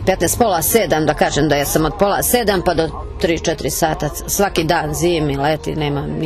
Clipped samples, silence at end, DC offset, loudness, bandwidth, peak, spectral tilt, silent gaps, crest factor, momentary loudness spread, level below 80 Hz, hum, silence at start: under 0.1%; 0 s; under 0.1%; -17 LUFS; 14 kHz; -4 dBFS; -4 dB/octave; none; 14 dB; 6 LU; -32 dBFS; none; 0 s